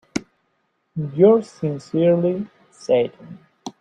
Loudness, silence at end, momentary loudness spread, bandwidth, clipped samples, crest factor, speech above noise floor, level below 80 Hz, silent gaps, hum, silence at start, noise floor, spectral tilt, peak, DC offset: -20 LUFS; 0.1 s; 20 LU; 9.8 kHz; under 0.1%; 18 dB; 51 dB; -62 dBFS; none; none; 0.15 s; -69 dBFS; -7.5 dB/octave; -4 dBFS; under 0.1%